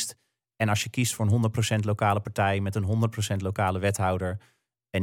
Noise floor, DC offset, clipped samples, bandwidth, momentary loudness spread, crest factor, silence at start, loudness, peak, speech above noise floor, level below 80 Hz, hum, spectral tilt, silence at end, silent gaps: -55 dBFS; under 0.1%; under 0.1%; 16.5 kHz; 6 LU; 16 dB; 0 s; -27 LUFS; -10 dBFS; 29 dB; -58 dBFS; none; -5 dB/octave; 0 s; none